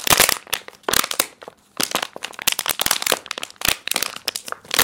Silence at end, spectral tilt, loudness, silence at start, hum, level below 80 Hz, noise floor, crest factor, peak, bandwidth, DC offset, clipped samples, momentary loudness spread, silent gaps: 0 s; 0 dB/octave; -20 LUFS; 0 s; none; -50 dBFS; -43 dBFS; 22 dB; 0 dBFS; over 20 kHz; under 0.1%; under 0.1%; 10 LU; none